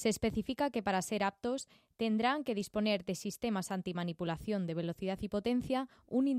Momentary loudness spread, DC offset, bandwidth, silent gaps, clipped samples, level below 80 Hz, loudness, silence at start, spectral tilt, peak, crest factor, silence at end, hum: 6 LU; under 0.1%; 15.5 kHz; none; under 0.1%; -62 dBFS; -36 LUFS; 0 s; -5 dB/octave; -20 dBFS; 16 dB; 0 s; none